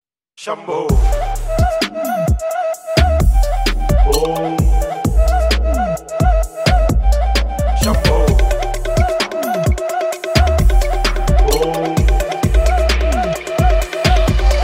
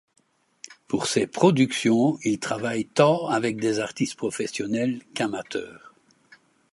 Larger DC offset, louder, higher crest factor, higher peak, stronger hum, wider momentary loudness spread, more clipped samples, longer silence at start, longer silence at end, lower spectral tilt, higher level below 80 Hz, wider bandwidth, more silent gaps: neither; first, -16 LUFS vs -24 LUFS; second, 14 dB vs 22 dB; first, 0 dBFS vs -4 dBFS; neither; second, 5 LU vs 12 LU; neither; second, 0.4 s vs 0.7 s; second, 0 s vs 0.95 s; about the same, -5.5 dB/octave vs -5 dB/octave; first, -16 dBFS vs -66 dBFS; first, 16.5 kHz vs 11.5 kHz; neither